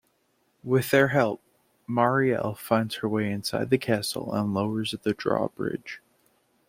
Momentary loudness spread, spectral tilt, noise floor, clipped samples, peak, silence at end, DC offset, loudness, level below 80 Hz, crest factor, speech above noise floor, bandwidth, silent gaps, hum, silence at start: 12 LU; -5.5 dB/octave; -70 dBFS; under 0.1%; -6 dBFS; 0.7 s; under 0.1%; -26 LUFS; -64 dBFS; 20 dB; 44 dB; 16.5 kHz; none; none; 0.65 s